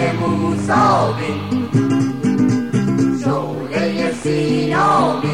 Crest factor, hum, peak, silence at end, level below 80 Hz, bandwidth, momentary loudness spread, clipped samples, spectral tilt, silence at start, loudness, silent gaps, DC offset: 12 dB; none; -4 dBFS; 0 s; -50 dBFS; 11.5 kHz; 6 LU; under 0.1%; -6.5 dB/octave; 0 s; -17 LUFS; none; 0.6%